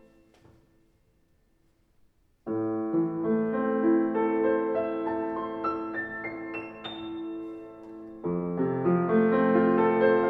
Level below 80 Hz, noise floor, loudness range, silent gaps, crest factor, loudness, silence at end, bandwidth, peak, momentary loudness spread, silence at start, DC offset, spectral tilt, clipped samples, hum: -64 dBFS; -67 dBFS; 7 LU; none; 18 dB; -27 LUFS; 0 s; 4.6 kHz; -8 dBFS; 15 LU; 2.45 s; under 0.1%; -10 dB/octave; under 0.1%; none